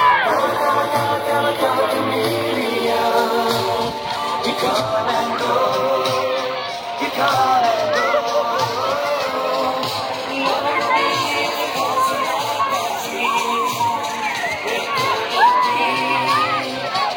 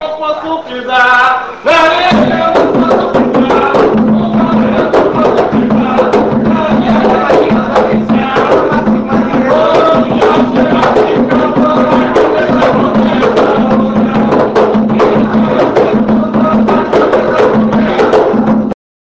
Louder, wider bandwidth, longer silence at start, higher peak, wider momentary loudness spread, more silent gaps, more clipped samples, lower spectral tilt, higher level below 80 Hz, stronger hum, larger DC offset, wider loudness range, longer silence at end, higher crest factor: second, -18 LUFS vs -9 LUFS; first, 18.5 kHz vs 8 kHz; about the same, 0 s vs 0 s; second, -4 dBFS vs 0 dBFS; first, 6 LU vs 3 LU; neither; second, under 0.1% vs 0.8%; second, -3 dB/octave vs -7 dB/octave; second, -58 dBFS vs -36 dBFS; neither; second, under 0.1% vs 0.4%; about the same, 2 LU vs 1 LU; second, 0 s vs 0.45 s; first, 16 dB vs 8 dB